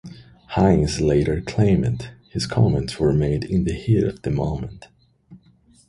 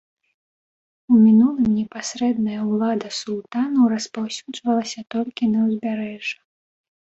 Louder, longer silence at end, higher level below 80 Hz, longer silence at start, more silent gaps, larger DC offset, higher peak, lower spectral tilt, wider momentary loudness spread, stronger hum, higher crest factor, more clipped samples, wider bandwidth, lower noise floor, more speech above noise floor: about the same, -21 LUFS vs -21 LUFS; second, 0.5 s vs 0.8 s; first, -36 dBFS vs -60 dBFS; second, 0.05 s vs 1.1 s; neither; neither; first, -2 dBFS vs -6 dBFS; first, -7 dB/octave vs -5.5 dB/octave; second, 10 LU vs 13 LU; neither; about the same, 18 dB vs 14 dB; neither; first, 11.5 kHz vs 8 kHz; second, -55 dBFS vs under -90 dBFS; second, 35 dB vs over 70 dB